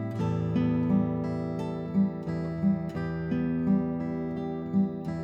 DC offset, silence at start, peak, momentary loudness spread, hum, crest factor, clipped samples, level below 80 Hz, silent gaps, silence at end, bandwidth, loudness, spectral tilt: under 0.1%; 0 s; -14 dBFS; 6 LU; none; 14 dB; under 0.1%; -52 dBFS; none; 0 s; 7 kHz; -29 LUFS; -10 dB/octave